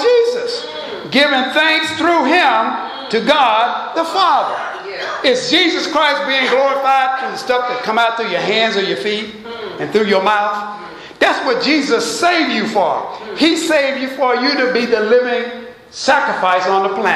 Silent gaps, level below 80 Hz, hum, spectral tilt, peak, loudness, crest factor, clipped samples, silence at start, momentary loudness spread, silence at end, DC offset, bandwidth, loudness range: none; -60 dBFS; none; -3 dB/octave; 0 dBFS; -15 LUFS; 16 dB; under 0.1%; 0 s; 11 LU; 0 s; under 0.1%; 14 kHz; 3 LU